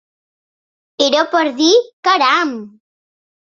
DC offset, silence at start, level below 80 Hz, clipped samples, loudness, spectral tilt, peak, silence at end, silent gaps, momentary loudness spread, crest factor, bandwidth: under 0.1%; 1 s; -66 dBFS; under 0.1%; -14 LUFS; -1.5 dB/octave; 0 dBFS; 0.75 s; 1.93-2.03 s; 6 LU; 16 dB; 7.4 kHz